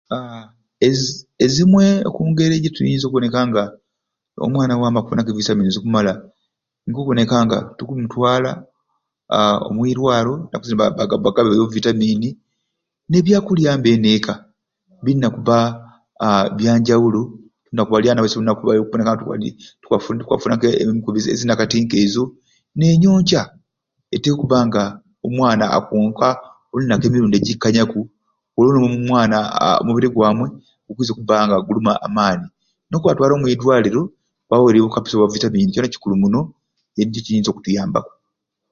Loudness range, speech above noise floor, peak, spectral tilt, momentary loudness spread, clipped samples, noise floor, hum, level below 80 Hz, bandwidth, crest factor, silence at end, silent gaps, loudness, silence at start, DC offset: 3 LU; 63 dB; 0 dBFS; -6 dB/octave; 11 LU; under 0.1%; -79 dBFS; none; -50 dBFS; 7.4 kHz; 16 dB; 0.65 s; none; -17 LUFS; 0.1 s; under 0.1%